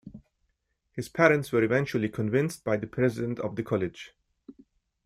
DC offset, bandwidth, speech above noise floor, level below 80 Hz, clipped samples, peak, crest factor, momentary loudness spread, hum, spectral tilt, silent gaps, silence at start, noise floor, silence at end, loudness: under 0.1%; 15.5 kHz; 49 dB; -62 dBFS; under 0.1%; -6 dBFS; 22 dB; 15 LU; none; -6.5 dB/octave; none; 0.05 s; -76 dBFS; 0.55 s; -27 LUFS